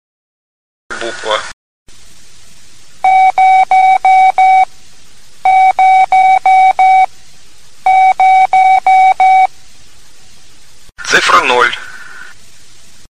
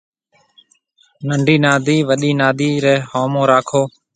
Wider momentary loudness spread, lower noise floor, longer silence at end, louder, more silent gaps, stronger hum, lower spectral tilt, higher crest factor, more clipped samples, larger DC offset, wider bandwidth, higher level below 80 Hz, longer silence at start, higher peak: first, 13 LU vs 6 LU; second, -43 dBFS vs -57 dBFS; second, 0 s vs 0.25 s; first, -8 LUFS vs -15 LUFS; first, 1.53-1.86 s vs none; neither; second, -1 dB/octave vs -5.5 dB/octave; about the same, 12 dB vs 16 dB; neither; first, 3% vs under 0.1%; first, 10.5 kHz vs 9.4 kHz; first, -48 dBFS vs -58 dBFS; second, 0.9 s vs 1.2 s; about the same, 0 dBFS vs 0 dBFS